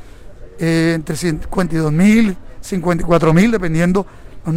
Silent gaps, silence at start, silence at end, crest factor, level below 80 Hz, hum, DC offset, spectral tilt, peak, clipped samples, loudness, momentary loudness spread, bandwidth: none; 0 s; 0 s; 12 dB; -32 dBFS; none; under 0.1%; -6.5 dB/octave; -2 dBFS; under 0.1%; -16 LUFS; 11 LU; 15.5 kHz